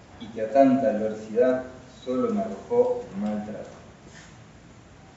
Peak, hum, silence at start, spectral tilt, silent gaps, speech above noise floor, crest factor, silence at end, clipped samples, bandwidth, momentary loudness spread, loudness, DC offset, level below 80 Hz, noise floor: -6 dBFS; none; 0.15 s; -6.5 dB/octave; none; 25 dB; 20 dB; 0.35 s; under 0.1%; 8 kHz; 20 LU; -25 LUFS; under 0.1%; -58 dBFS; -49 dBFS